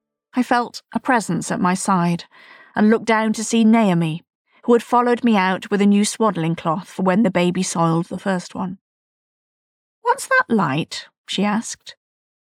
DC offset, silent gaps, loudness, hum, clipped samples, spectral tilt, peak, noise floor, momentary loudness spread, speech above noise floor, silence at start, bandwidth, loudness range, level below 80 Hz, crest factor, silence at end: under 0.1%; 4.35-4.45 s, 8.81-10.02 s, 11.18-11.24 s; -19 LUFS; none; under 0.1%; -5.5 dB/octave; -6 dBFS; under -90 dBFS; 12 LU; over 72 dB; 0.35 s; 14 kHz; 5 LU; -66 dBFS; 14 dB; 0.55 s